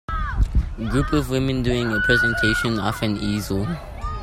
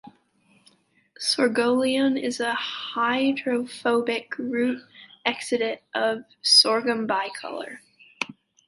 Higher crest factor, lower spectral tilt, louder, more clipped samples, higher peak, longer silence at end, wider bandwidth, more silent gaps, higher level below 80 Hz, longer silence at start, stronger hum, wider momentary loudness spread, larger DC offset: about the same, 16 dB vs 20 dB; first, -5.5 dB/octave vs -2 dB/octave; about the same, -22 LUFS vs -23 LUFS; neither; about the same, -4 dBFS vs -4 dBFS; second, 0 s vs 0.35 s; first, 16 kHz vs 11.5 kHz; neither; first, -28 dBFS vs -76 dBFS; about the same, 0.1 s vs 0.05 s; neither; second, 8 LU vs 14 LU; neither